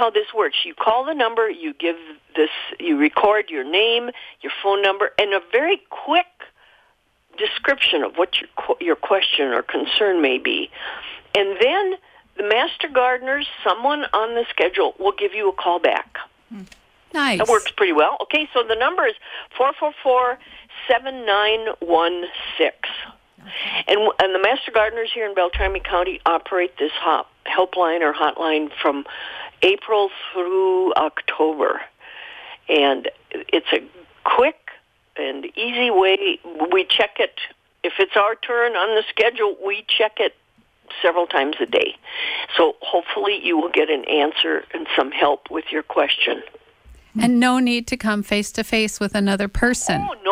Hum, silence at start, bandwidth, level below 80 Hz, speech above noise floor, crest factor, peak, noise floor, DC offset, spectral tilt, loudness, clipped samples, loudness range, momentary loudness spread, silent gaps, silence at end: none; 0 s; 16 kHz; -46 dBFS; 41 dB; 16 dB; -4 dBFS; -61 dBFS; under 0.1%; -3.5 dB/octave; -20 LUFS; under 0.1%; 2 LU; 11 LU; none; 0 s